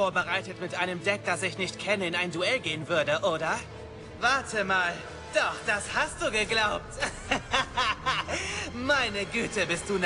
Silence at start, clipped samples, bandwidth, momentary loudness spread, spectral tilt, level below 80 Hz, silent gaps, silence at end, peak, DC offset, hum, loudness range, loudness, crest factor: 0 s; under 0.1%; 11.5 kHz; 6 LU; -3 dB/octave; -52 dBFS; none; 0 s; -12 dBFS; under 0.1%; none; 1 LU; -28 LUFS; 18 dB